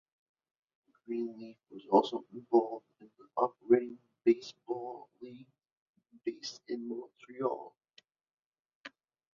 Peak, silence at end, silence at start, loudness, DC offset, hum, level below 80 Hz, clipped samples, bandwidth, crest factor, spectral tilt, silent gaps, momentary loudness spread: -12 dBFS; 0.45 s; 1.1 s; -34 LUFS; under 0.1%; none; -82 dBFS; under 0.1%; 7.2 kHz; 24 dB; -4.5 dB/octave; 5.73-5.94 s, 8.33-8.52 s, 8.60-8.65 s, 8.75-8.84 s; 22 LU